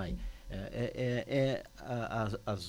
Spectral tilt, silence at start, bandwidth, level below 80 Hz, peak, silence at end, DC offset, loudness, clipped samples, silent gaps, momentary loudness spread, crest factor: -6.5 dB/octave; 0 s; 16.5 kHz; -48 dBFS; -20 dBFS; 0 s; under 0.1%; -36 LUFS; under 0.1%; none; 11 LU; 16 dB